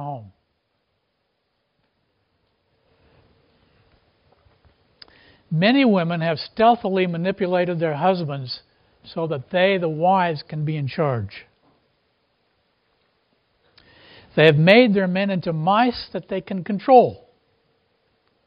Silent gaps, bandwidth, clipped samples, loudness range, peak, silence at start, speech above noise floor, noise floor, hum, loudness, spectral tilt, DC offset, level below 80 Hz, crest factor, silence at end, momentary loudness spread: none; 5.4 kHz; under 0.1%; 10 LU; 0 dBFS; 0 s; 53 dB; -72 dBFS; none; -19 LUFS; -4.5 dB/octave; under 0.1%; -62 dBFS; 22 dB; 1.3 s; 14 LU